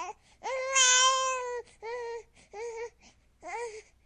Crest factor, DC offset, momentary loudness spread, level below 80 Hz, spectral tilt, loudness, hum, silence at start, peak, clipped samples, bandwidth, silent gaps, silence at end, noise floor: 20 dB; under 0.1%; 22 LU; -68 dBFS; 3 dB/octave; -26 LUFS; none; 0 s; -10 dBFS; under 0.1%; 10.5 kHz; none; 0.25 s; -61 dBFS